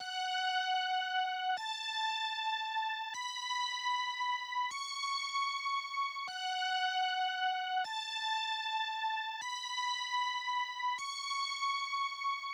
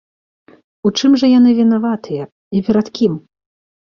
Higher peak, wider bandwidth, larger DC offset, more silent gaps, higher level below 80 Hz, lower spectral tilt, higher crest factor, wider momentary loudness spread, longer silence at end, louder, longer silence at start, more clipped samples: second, -24 dBFS vs -2 dBFS; first, over 20 kHz vs 7 kHz; neither; second, none vs 2.32-2.51 s; second, under -90 dBFS vs -56 dBFS; second, 3.5 dB/octave vs -6 dB/octave; about the same, 12 dB vs 12 dB; second, 4 LU vs 13 LU; second, 0 s vs 0.75 s; second, -35 LUFS vs -14 LUFS; second, 0 s vs 0.85 s; neither